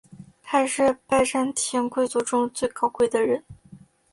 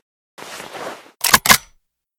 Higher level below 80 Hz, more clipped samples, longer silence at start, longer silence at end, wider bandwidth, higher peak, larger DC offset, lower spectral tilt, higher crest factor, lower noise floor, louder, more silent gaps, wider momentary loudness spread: second, -58 dBFS vs -46 dBFS; second, under 0.1% vs 0.3%; second, 0.1 s vs 0.4 s; second, 0.35 s vs 0.6 s; second, 11.5 kHz vs over 20 kHz; second, -8 dBFS vs 0 dBFS; neither; first, -3 dB/octave vs -0.5 dB/octave; about the same, 16 dB vs 20 dB; second, -50 dBFS vs -59 dBFS; second, -23 LUFS vs -13 LUFS; neither; second, 4 LU vs 22 LU